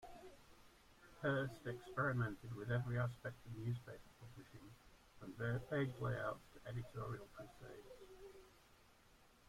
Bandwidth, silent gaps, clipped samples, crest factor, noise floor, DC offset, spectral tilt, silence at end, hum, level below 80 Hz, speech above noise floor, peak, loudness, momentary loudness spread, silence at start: 15.5 kHz; none; under 0.1%; 20 dB; -69 dBFS; under 0.1%; -7.5 dB/octave; 0.25 s; none; -68 dBFS; 24 dB; -28 dBFS; -45 LUFS; 21 LU; 0 s